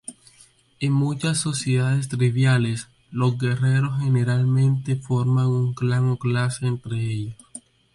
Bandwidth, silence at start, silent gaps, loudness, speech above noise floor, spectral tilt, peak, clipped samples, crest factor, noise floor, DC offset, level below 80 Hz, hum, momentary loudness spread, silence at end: 11.5 kHz; 0.1 s; none; -22 LUFS; 34 dB; -6 dB/octave; -8 dBFS; under 0.1%; 14 dB; -55 dBFS; under 0.1%; -56 dBFS; none; 11 LU; 0.35 s